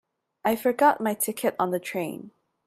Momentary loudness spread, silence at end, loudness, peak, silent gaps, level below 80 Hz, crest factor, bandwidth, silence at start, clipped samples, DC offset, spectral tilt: 11 LU; 0.35 s; -25 LUFS; -6 dBFS; none; -70 dBFS; 20 dB; 16 kHz; 0.45 s; under 0.1%; under 0.1%; -4 dB/octave